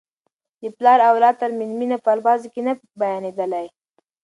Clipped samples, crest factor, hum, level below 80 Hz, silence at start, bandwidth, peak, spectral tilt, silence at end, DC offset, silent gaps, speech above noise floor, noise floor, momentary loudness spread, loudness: under 0.1%; 18 dB; none; -76 dBFS; 0.6 s; 10.5 kHz; -2 dBFS; -6 dB/octave; 0.55 s; under 0.1%; none; 57 dB; -75 dBFS; 14 LU; -19 LUFS